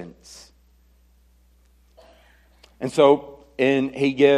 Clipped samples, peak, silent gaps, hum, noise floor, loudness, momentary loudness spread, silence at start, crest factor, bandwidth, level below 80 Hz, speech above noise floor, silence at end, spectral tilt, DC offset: under 0.1%; -2 dBFS; none; none; -57 dBFS; -20 LUFS; 25 LU; 0 s; 20 dB; 11.5 kHz; -58 dBFS; 38 dB; 0 s; -6 dB/octave; under 0.1%